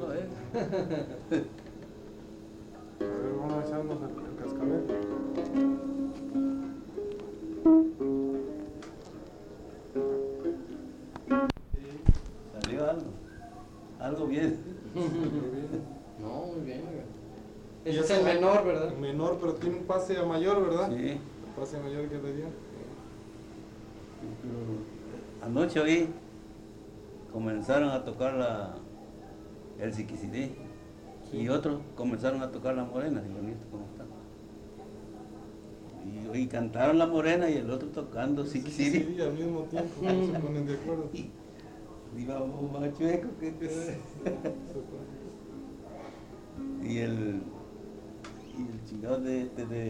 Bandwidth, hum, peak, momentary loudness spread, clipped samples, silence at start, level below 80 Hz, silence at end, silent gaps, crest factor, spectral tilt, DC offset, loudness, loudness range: 10.5 kHz; none; -6 dBFS; 20 LU; under 0.1%; 0 s; -46 dBFS; 0 s; none; 28 dB; -7 dB/octave; under 0.1%; -32 LUFS; 9 LU